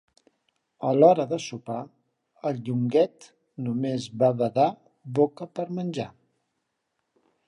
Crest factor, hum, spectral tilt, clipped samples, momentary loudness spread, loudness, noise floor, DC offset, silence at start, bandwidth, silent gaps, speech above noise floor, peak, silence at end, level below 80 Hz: 22 dB; none; -7 dB/octave; under 0.1%; 16 LU; -25 LUFS; -79 dBFS; under 0.1%; 0.8 s; 11 kHz; none; 54 dB; -4 dBFS; 1.4 s; -72 dBFS